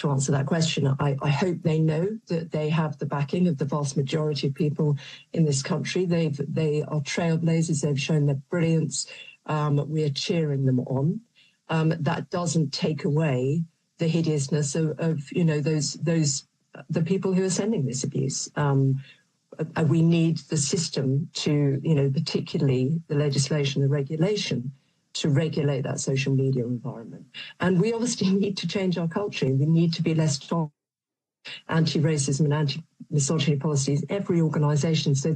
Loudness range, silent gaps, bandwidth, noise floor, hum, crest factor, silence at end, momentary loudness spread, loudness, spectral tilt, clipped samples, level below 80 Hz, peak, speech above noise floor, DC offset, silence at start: 2 LU; none; 9.8 kHz; under -90 dBFS; none; 14 dB; 0 s; 6 LU; -25 LUFS; -6 dB/octave; under 0.1%; -64 dBFS; -10 dBFS; over 66 dB; under 0.1%; 0 s